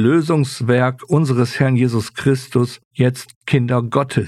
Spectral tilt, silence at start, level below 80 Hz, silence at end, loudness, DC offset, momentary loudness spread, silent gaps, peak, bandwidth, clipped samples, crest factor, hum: -7 dB/octave; 0 s; -52 dBFS; 0 s; -17 LUFS; under 0.1%; 4 LU; 2.85-2.91 s, 3.36-3.41 s; -2 dBFS; 13 kHz; under 0.1%; 14 dB; none